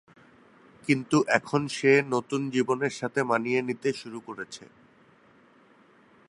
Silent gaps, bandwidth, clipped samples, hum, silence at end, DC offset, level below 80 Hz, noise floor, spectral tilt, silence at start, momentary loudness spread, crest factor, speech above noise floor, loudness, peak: none; 11.5 kHz; under 0.1%; none; 1.65 s; under 0.1%; -72 dBFS; -59 dBFS; -5.5 dB/octave; 0.85 s; 17 LU; 24 dB; 32 dB; -26 LUFS; -4 dBFS